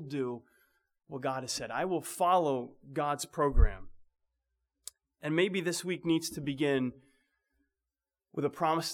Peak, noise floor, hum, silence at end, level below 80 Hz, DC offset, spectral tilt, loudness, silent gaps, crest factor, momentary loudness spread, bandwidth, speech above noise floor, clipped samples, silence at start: -12 dBFS; under -90 dBFS; none; 0 s; -40 dBFS; under 0.1%; -5 dB/octave; -32 LUFS; none; 22 dB; 16 LU; 18 kHz; over 59 dB; under 0.1%; 0 s